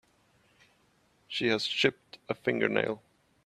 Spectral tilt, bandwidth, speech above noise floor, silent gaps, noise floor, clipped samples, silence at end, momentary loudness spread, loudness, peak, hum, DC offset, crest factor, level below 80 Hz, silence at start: -4.5 dB/octave; 13 kHz; 39 dB; none; -68 dBFS; under 0.1%; 0.45 s; 12 LU; -30 LUFS; -10 dBFS; none; under 0.1%; 24 dB; -72 dBFS; 1.3 s